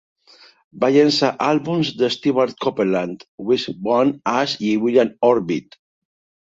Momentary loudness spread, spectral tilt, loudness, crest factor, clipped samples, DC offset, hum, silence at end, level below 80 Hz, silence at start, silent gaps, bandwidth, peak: 6 LU; -5.5 dB/octave; -19 LUFS; 18 dB; under 0.1%; under 0.1%; none; 0.95 s; -62 dBFS; 0.75 s; 3.28-3.38 s; 7.8 kHz; -2 dBFS